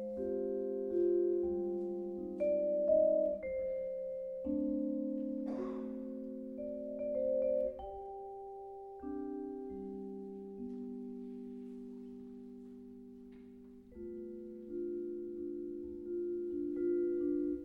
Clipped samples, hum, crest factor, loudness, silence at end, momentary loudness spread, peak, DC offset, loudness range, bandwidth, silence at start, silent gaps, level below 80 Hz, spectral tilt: under 0.1%; none; 18 dB; -38 LUFS; 0 s; 17 LU; -20 dBFS; under 0.1%; 14 LU; 3.2 kHz; 0 s; none; -66 dBFS; -10.5 dB/octave